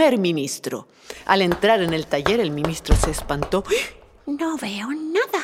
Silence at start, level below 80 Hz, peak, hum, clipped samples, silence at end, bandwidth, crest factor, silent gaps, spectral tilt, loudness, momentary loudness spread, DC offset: 0 s; -30 dBFS; -2 dBFS; none; under 0.1%; 0 s; 16.5 kHz; 20 dB; none; -4.5 dB/octave; -22 LUFS; 13 LU; under 0.1%